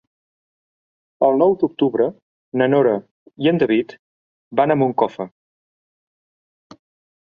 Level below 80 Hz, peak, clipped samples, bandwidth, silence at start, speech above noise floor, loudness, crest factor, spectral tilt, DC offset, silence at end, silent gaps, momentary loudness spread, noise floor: -66 dBFS; -2 dBFS; under 0.1%; 6.4 kHz; 1.2 s; over 73 dB; -19 LUFS; 18 dB; -9 dB/octave; under 0.1%; 1.95 s; 2.22-2.52 s, 3.11-3.26 s, 3.99-4.51 s; 10 LU; under -90 dBFS